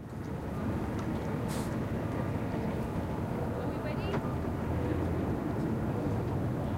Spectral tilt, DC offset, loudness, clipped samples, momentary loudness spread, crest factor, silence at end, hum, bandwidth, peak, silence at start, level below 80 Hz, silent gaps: -8 dB/octave; under 0.1%; -34 LUFS; under 0.1%; 2 LU; 14 dB; 0 s; none; 16 kHz; -18 dBFS; 0 s; -44 dBFS; none